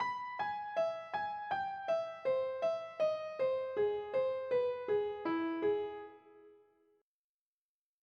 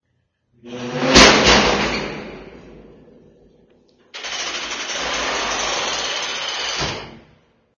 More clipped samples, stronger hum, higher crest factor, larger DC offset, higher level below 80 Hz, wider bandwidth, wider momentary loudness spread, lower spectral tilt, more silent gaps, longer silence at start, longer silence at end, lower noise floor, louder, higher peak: neither; neither; second, 14 dB vs 20 dB; neither; second, -80 dBFS vs -38 dBFS; second, 6.6 kHz vs 11 kHz; second, 4 LU vs 23 LU; first, -6 dB/octave vs -2.5 dB/octave; neither; second, 0 s vs 0.65 s; first, 1.5 s vs 0.6 s; first, under -90 dBFS vs -69 dBFS; second, -36 LUFS vs -17 LUFS; second, -24 dBFS vs 0 dBFS